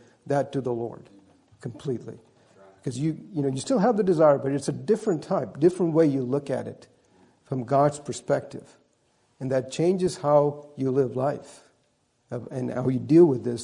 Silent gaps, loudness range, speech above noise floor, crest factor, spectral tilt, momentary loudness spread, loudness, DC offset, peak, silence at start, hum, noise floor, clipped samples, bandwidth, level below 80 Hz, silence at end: none; 6 LU; 44 dB; 18 dB; -7 dB/octave; 16 LU; -25 LUFS; under 0.1%; -6 dBFS; 0.25 s; none; -69 dBFS; under 0.1%; 11 kHz; -66 dBFS; 0 s